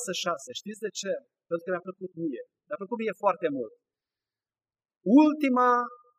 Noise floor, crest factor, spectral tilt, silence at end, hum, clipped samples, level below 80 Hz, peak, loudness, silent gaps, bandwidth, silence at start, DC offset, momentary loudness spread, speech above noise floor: under -90 dBFS; 20 dB; -4.5 dB/octave; 0.25 s; none; under 0.1%; under -90 dBFS; -10 dBFS; -27 LUFS; 4.97-5.01 s; 15 kHz; 0 s; under 0.1%; 17 LU; over 63 dB